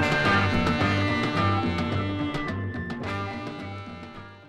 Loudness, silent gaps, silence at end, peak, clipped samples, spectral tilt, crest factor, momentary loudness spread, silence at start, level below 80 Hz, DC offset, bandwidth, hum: -26 LUFS; none; 0 s; -8 dBFS; under 0.1%; -6 dB/octave; 18 dB; 16 LU; 0 s; -44 dBFS; under 0.1%; 11 kHz; none